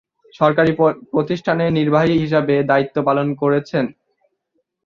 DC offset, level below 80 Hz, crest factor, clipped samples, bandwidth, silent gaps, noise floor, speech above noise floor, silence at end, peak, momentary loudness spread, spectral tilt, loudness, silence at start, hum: under 0.1%; -52 dBFS; 16 dB; under 0.1%; 7 kHz; none; -71 dBFS; 54 dB; 0.95 s; -2 dBFS; 6 LU; -8 dB/octave; -17 LUFS; 0.4 s; none